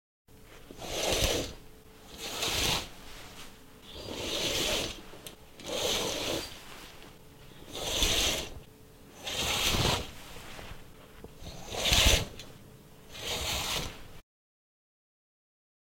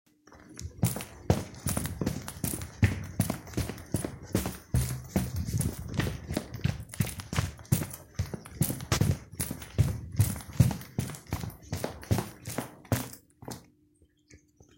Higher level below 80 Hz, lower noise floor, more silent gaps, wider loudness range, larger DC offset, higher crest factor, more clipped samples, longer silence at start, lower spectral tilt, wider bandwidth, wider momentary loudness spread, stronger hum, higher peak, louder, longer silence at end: about the same, -44 dBFS vs -46 dBFS; second, -53 dBFS vs -65 dBFS; neither; about the same, 5 LU vs 3 LU; neither; about the same, 26 dB vs 24 dB; neither; about the same, 0.3 s vs 0.3 s; second, -2 dB/octave vs -5.5 dB/octave; about the same, 16.5 kHz vs 17 kHz; first, 23 LU vs 9 LU; neither; about the same, -8 dBFS vs -8 dBFS; about the same, -30 LUFS vs -32 LUFS; first, 1.8 s vs 0.4 s